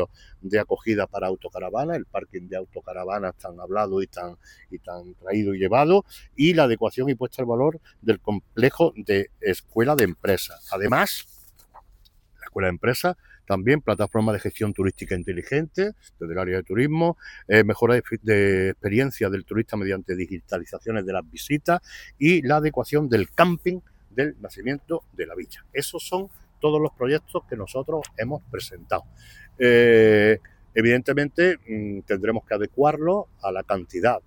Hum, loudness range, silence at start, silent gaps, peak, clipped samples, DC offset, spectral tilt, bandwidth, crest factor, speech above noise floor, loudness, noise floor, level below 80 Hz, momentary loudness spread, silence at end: none; 8 LU; 0 s; none; -2 dBFS; under 0.1%; under 0.1%; -6 dB/octave; 19 kHz; 22 dB; 32 dB; -23 LUFS; -55 dBFS; -52 dBFS; 14 LU; 0.1 s